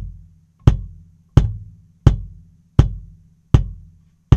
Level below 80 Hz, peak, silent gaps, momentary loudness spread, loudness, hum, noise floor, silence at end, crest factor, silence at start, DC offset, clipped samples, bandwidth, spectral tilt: -24 dBFS; 0 dBFS; none; 20 LU; -19 LUFS; none; -49 dBFS; 0 s; 18 dB; 0 s; under 0.1%; 0.3%; 8 kHz; -8.5 dB/octave